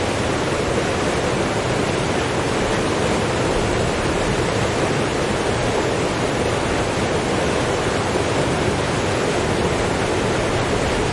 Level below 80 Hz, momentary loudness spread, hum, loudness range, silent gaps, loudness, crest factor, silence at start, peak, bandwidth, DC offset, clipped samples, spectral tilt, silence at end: -34 dBFS; 1 LU; none; 0 LU; none; -20 LUFS; 14 dB; 0 s; -6 dBFS; 11.5 kHz; under 0.1%; under 0.1%; -4.5 dB/octave; 0 s